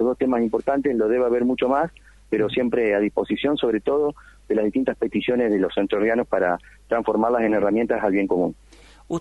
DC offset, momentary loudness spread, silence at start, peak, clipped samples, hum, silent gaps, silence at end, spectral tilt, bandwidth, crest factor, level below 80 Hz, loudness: under 0.1%; 4 LU; 0 s; -6 dBFS; under 0.1%; none; none; 0 s; -7 dB/octave; 11 kHz; 16 dB; -50 dBFS; -22 LUFS